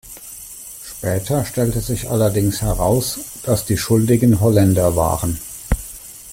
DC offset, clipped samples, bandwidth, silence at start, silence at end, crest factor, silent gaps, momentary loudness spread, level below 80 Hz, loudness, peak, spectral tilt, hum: under 0.1%; under 0.1%; 16.5 kHz; 0.05 s; 0 s; 14 dB; none; 18 LU; -32 dBFS; -18 LUFS; -4 dBFS; -6 dB/octave; none